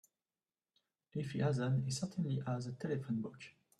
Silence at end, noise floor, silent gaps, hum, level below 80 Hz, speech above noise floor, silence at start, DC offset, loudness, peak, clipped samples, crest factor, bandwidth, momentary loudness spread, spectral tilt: 0.3 s; under -90 dBFS; none; none; -74 dBFS; over 52 dB; 1.15 s; under 0.1%; -39 LUFS; -24 dBFS; under 0.1%; 16 dB; 11.5 kHz; 10 LU; -6.5 dB/octave